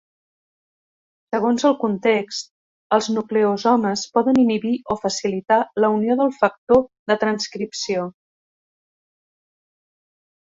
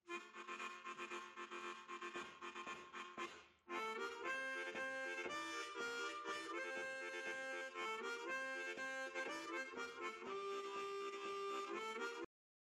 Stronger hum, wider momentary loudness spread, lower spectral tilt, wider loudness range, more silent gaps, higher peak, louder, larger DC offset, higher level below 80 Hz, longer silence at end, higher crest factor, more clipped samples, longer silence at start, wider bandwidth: neither; about the same, 8 LU vs 6 LU; first, -4.5 dB/octave vs -1.5 dB/octave; about the same, 5 LU vs 4 LU; first, 2.51-2.90 s, 6.58-6.67 s, 6.99-7.06 s vs none; first, -2 dBFS vs -32 dBFS; first, -20 LUFS vs -47 LUFS; neither; first, -58 dBFS vs -90 dBFS; first, 2.3 s vs 0.4 s; about the same, 18 dB vs 16 dB; neither; first, 1.3 s vs 0.05 s; second, 8 kHz vs 14.5 kHz